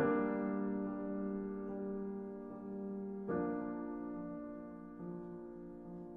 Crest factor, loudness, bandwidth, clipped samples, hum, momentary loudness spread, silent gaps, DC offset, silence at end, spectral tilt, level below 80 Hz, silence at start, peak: 18 dB; -42 LUFS; 3.5 kHz; under 0.1%; none; 12 LU; none; under 0.1%; 0 s; -11 dB/octave; -66 dBFS; 0 s; -22 dBFS